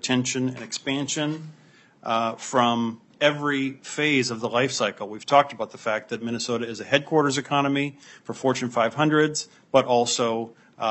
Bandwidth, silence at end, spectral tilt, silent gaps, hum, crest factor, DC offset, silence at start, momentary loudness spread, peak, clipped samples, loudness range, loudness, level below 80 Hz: 8.6 kHz; 0 s; -4 dB/octave; none; none; 22 dB; under 0.1%; 0.05 s; 10 LU; -2 dBFS; under 0.1%; 2 LU; -24 LUFS; -72 dBFS